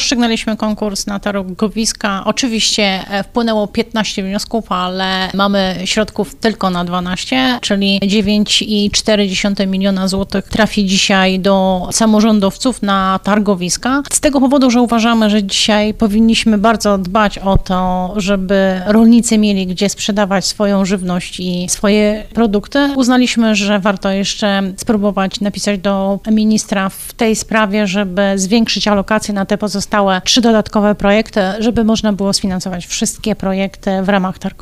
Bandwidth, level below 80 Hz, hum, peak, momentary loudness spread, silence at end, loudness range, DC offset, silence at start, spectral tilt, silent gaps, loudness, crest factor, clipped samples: 14.5 kHz; -34 dBFS; none; 0 dBFS; 7 LU; 0.1 s; 3 LU; under 0.1%; 0 s; -4 dB/octave; none; -14 LUFS; 12 dB; under 0.1%